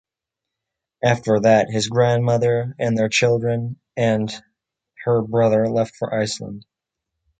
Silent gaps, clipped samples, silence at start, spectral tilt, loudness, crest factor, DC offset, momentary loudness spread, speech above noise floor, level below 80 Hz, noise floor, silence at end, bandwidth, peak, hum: none; under 0.1%; 1.05 s; -5.5 dB/octave; -20 LUFS; 18 dB; under 0.1%; 12 LU; 66 dB; -56 dBFS; -85 dBFS; 0.8 s; 9.4 kHz; -2 dBFS; none